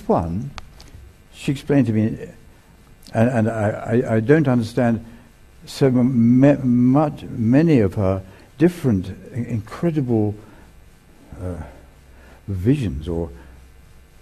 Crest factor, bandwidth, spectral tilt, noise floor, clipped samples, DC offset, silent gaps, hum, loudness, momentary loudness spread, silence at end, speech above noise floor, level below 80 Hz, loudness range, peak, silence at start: 20 dB; 13.5 kHz; -8.5 dB/octave; -48 dBFS; under 0.1%; under 0.1%; none; none; -19 LUFS; 17 LU; 0.65 s; 30 dB; -44 dBFS; 9 LU; 0 dBFS; 0 s